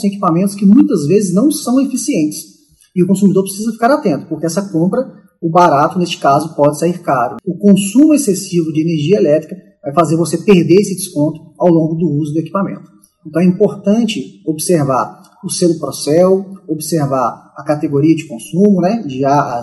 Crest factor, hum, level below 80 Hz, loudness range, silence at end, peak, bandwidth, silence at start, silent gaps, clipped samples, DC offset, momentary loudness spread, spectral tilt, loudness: 12 dB; none; -58 dBFS; 3 LU; 0 s; 0 dBFS; 12.5 kHz; 0 s; none; 0.2%; under 0.1%; 10 LU; -6.5 dB/octave; -13 LUFS